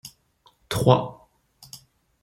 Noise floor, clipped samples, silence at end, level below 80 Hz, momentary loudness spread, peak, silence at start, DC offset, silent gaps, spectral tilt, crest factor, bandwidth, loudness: -62 dBFS; under 0.1%; 0.45 s; -54 dBFS; 25 LU; -2 dBFS; 0.05 s; under 0.1%; none; -6 dB/octave; 24 dB; 16.5 kHz; -22 LUFS